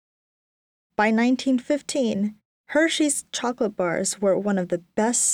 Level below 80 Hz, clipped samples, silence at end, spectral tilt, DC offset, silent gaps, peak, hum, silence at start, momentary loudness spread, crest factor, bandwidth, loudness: -66 dBFS; under 0.1%; 0 s; -3.5 dB/octave; under 0.1%; 2.45-2.64 s; -8 dBFS; none; 1 s; 7 LU; 16 dB; 19 kHz; -23 LUFS